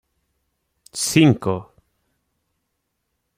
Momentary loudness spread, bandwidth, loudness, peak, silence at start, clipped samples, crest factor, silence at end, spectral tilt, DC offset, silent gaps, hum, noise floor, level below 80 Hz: 15 LU; 16 kHz; -18 LUFS; -2 dBFS; 0.95 s; under 0.1%; 22 dB; 1.75 s; -5 dB/octave; under 0.1%; none; none; -75 dBFS; -58 dBFS